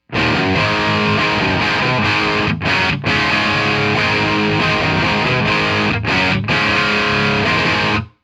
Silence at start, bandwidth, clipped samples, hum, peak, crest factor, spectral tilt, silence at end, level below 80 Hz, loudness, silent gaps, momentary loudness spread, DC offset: 0.1 s; 12.5 kHz; under 0.1%; none; -4 dBFS; 12 dB; -5 dB/octave; 0.15 s; -38 dBFS; -15 LUFS; none; 1 LU; under 0.1%